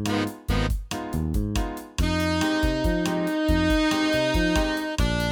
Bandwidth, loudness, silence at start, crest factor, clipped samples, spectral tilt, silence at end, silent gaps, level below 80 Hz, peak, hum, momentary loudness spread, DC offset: 19.5 kHz; -25 LUFS; 0 s; 14 dB; under 0.1%; -5 dB/octave; 0 s; none; -30 dBFS; -10 dBFS; none; 7 LU; under 0.1%